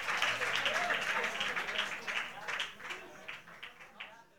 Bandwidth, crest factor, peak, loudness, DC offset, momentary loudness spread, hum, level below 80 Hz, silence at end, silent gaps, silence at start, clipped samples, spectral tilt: 19 kHz; 22 dB; -16 dBFS; -34 LUFS; 0.1%; 17 LU; none; -72 dBFS; 0 s; none; 0 s; under 0.1%; -1 dB/octave